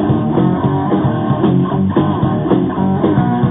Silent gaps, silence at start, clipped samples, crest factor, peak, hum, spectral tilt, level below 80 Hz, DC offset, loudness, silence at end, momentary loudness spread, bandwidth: none; 0 s; under 0.1%; 12 dB; 0 dBFS; none; -12.5 dB/octave; -38 dBFS; 0.1%; -14 LUFS; 0 s; 2 LU; 3.9 kHz